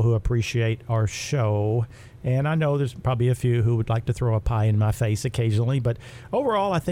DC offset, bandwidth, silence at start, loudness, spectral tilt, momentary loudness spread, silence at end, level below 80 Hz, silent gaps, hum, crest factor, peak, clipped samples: under 0.1%; 13 kHz; 0 s; -24 LUFS; -7 dB/octave; 4 LU; 0 s; -40 dBFS; none; none; 12 dB; -10 dBFS; under 0.1%